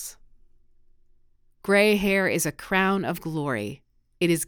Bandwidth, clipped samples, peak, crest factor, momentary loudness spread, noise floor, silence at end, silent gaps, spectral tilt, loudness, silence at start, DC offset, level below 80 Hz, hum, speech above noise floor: over 20 kHz; under 0.1%; -8 dBFS; 18 dB; 13 LU; -59 dBFS; 0 s; none; -4.5 dB/octave; -23 LUFS; 0 s; under 0.1%; -54 dBFS; none; 36 dB